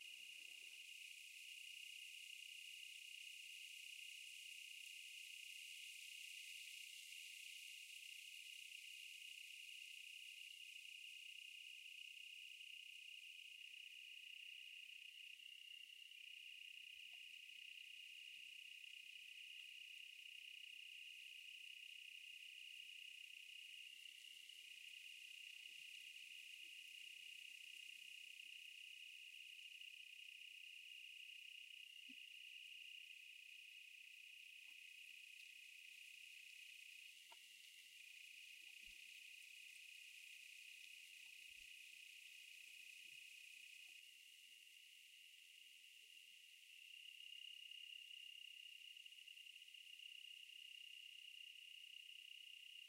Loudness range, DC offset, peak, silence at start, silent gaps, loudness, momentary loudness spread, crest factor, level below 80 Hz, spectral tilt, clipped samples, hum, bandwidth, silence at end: 4 LU; under 0.1%; -42 dBFS; 0 s; none; -56 LUFS; 4 LU; 16 dB; under -90 dBFS; 5 dB/octave; under 0.1%; none; 16 kHz; 0 s